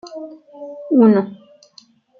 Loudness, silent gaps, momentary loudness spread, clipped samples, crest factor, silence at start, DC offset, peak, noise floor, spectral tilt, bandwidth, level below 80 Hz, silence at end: -14 LUFS; none; 24 LU; under 0.1%; 18 dB; 0.05 s; under 0.1%; -2 dBFS; -50 dBFS; -8.5 dB/octave; 6.6 kHz; -68 dBFS; 0.85 s